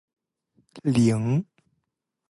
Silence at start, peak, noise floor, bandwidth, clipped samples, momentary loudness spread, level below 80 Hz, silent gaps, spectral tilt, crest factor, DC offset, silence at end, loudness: 0.75 s; -10 dBFS; -80 dBFS; 11.5 kHz; under 0.1%; 11 LU; -60 dBFS; none; -7.5 dB/octave; 18 dB; under 0.1%; 0.85 s; -24 LUFS